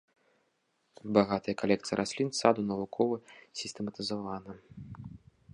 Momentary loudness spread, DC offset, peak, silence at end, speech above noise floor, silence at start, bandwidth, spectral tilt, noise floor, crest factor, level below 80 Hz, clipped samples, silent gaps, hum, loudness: 20 LU; under 0.1%; -8 dBFS; 0.35 s; 44 dB; 1.05 s; 11 kHz; -5 dB/octave; -76 dBFS; 26 dB; -66 dBFS; under 0.1%; none; none; -31 LUFS